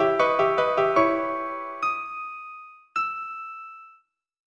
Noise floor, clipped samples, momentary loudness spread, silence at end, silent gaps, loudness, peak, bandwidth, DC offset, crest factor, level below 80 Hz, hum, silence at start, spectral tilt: -60 dBFS; under 0.1%; 18 LU; 0.6 s; none; -25 LUFS; -6 dBFS; 9.6 kHz; under 0.1%; 20 dB; -64 dBFS; none; 0 s; -5.5 dB/octave